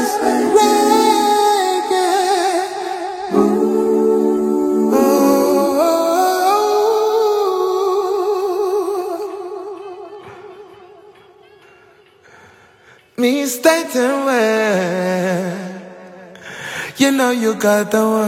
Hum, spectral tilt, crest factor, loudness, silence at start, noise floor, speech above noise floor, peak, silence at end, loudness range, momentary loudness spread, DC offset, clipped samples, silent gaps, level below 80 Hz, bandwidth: none; -4 dB/octave; 16 dB; -15 LUFS; 0 s; -48 dBFS; 33 dB; 0 dBFS; 0 s; 11 LU; 16 LU; under 0.1%; under 0.1%; none; -60 dBFS; 16.5 kHz